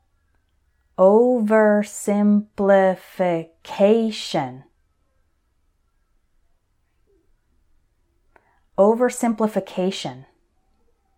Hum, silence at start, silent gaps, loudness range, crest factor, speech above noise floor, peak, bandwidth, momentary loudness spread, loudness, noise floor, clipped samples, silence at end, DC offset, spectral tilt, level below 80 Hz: none; 1 s; none; 9 LU; 18 dB; 47 dB; -4 dBFS; 15.5 kHz; 13 LU; -19 LUFS; -66 dBFS; under 0.1%; 0.95 s; under 0.1%; -6 dB/octave; -62 dBFS